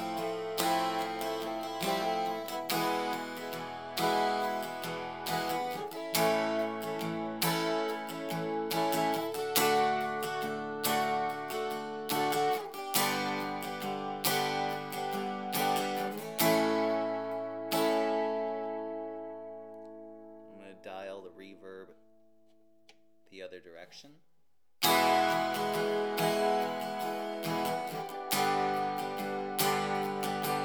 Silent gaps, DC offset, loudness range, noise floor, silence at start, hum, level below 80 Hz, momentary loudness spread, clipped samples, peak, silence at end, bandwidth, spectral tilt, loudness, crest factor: none; under 0.1%; 15 LU; -80 dBFS; 0 s; none; -82 dBFS; 17 LU; under 0.1%; -8 dBFS; 0 s; over 20 kHz; -3.5 dB/octave; -32 LUFS; 26 dB